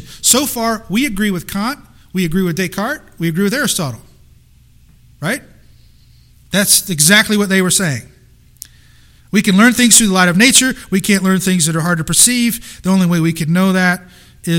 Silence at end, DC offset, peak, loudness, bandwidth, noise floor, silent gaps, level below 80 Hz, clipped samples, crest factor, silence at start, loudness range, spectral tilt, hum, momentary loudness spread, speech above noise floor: 0 s; under 0.1%; 0 dBFS; -13 LUFS; over 20 kHz; -46 dBFS; none; -42 dBFS; 0.1%; 14 dB; 0 s; 9 LU; -3 dB/octave; none; 13 LU; 33 dB